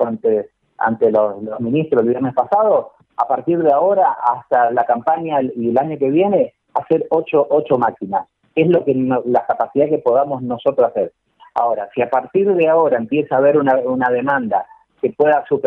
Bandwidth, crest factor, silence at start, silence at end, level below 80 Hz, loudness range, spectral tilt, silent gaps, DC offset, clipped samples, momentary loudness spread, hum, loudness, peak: 4.1 kHz; 14 dB; 0 s; 0 s; -62 dBFS; 2 LU; -9.5 dB/octave; none; under 0.1%; under 0.1%; 8 LU; none; -17 LUFS; -4 dBFS